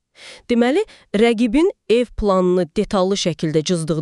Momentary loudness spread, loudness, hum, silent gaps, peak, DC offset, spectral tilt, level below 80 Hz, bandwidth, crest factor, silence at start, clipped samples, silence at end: 4 LU; -18 LUFS; none; none; -4 dBFS; under 0.1%; -5.5 dB/octave; -40 dBFS; 11.5 kHz; 14 dB; 0.2 s; under 0.1%; 0 s